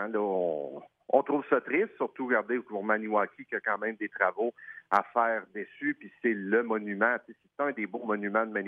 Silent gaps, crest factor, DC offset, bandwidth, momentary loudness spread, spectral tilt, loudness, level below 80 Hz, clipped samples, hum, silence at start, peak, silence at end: none; 20 dB; under 0.1%; 6.6 kHz; 7 LU; -8 dB/octave; -30 LUFS; -84 dBFS; under 0.1%; none; 0 s; -10 dBFS; 0 s